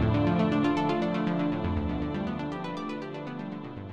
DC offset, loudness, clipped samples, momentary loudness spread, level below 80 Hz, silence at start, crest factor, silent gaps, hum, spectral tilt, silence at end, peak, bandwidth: under 0.1%; -30 LUFS; under 0.1%; 12 LU; -44 dBFS; 0 s; 16 dB; none; none; -8 dB/octave; 0 s; -14 dBFS; 8 kHz